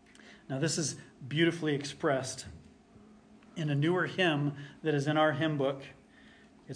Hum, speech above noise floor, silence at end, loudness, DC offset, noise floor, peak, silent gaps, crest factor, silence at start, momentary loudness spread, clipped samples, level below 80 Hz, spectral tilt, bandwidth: none; 27 dB; 0 s; -31 LUFS; under 0.1%; -58 dBFS; -14 dBFS; none; 18 dB; 0.25 s; 15 LU; under 0.1%; -68 dBFS; -5 dB/octave; 10.5 kHz